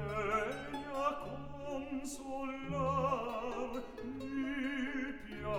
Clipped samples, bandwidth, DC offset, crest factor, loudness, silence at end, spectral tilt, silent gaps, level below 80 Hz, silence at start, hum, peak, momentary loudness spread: under 0.1%; 16 kHz; 0.1%; 18 dB; -39 LUFS; 0 s; -5.5 dB/octave; none; -56 dBFS; 0 s; none; -22 dBFS; 9 LU